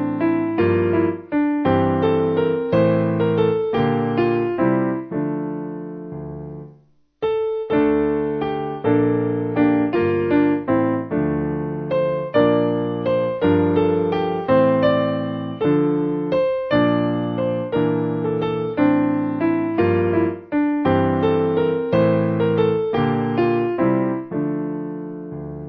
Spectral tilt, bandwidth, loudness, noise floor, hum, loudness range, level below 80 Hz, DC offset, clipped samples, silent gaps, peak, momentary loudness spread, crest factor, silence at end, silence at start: -10.5 dB/octave; 5.2 kHz; -20 LUFS; -53 dBFS; none; 4 LU; -46 dBFS; under 0.1%; under 0.1%; none; -4 dBFS; 7 LU; 14 dB; 0 s; 0 s